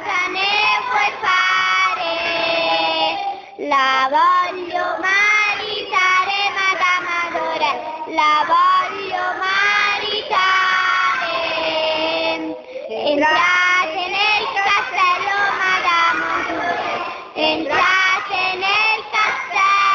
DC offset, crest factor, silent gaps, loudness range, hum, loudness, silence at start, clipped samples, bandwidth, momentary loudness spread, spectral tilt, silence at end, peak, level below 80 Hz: under 0.1%; 14 dB; none; 2 LU; none; -16 LUFS; 0 s; under 0.1%; 7.4 kHz; 8 LU; -1.5 dB/octave; 0 s; -4 dBFS; -58 dBFS